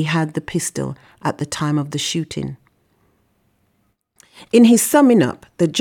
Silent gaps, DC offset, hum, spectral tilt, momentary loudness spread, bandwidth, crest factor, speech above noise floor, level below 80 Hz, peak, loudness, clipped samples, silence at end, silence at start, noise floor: none; under 0.1%; none; -5 dB/octave; 15 LU; 18 kHz; 16 dB; 49 dB; -56 dBFS; -2 dBFS; -17 LUFS; under 0.1%; 0 s; 0 s; -66 dBFS